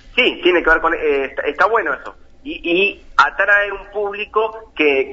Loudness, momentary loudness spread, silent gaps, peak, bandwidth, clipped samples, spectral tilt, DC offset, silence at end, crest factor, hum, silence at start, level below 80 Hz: -16 LUFS; 10 LU; none; 0 dBFS; 7.8 kHz; under 0.1%; -4 dB/octave; under 0.1%; 0 s; 16 dB; none; 0.05 s; -42 dBFS